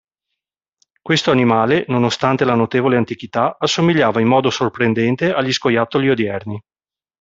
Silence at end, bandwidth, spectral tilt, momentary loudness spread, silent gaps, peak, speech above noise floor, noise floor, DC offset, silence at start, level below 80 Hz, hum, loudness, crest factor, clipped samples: 0.6 s; 7.8 kHz; -5.5 dB/octave; 6 LU; none; -2 dBFS; 65 dB; -81 dBFS; under 0.1%; 1.05 s; -56 dBFS; none; -16 LUFS; 16 dB; under 0.1%